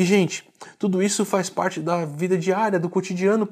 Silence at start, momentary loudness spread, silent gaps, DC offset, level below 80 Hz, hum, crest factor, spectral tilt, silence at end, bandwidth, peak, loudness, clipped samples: 0 s; 4 LU; none; under 0.1%; -74 dBFS; none; 16 dB; -5 dB/octave; 0 s; 15.5 kHz; -6 dBFS; -23 LUFS; under 0.1%